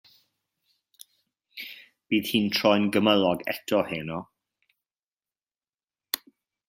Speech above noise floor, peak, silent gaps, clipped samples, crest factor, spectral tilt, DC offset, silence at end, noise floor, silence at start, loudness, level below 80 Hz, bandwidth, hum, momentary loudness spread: over 66 dB; -2 dBFS; 4.99-5.17 s, 5.69-5.73 s, 5.84-5.88 s; under 0.1%; 26 dB; -5 dB/octave; under 0.1%; 0.5 s; under -90 dBFS; 1.55 s; -25 LUFS; -68 dBFS; 16.5 kHz; none; 18 LU